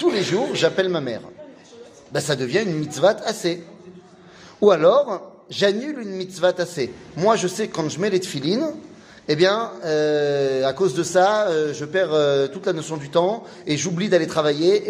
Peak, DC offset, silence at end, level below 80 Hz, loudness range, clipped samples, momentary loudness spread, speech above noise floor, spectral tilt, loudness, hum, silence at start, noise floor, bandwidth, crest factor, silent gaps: -2 dBFS; under 0.1%; 0 s; -64 dBFS; 3 LU; under 0.1%; 11 LU; 25 dB; -4.5 dB/octave; -21 LUFS; none; 0 s; -46 dBFS; 15.5 kHz; 18 dB; none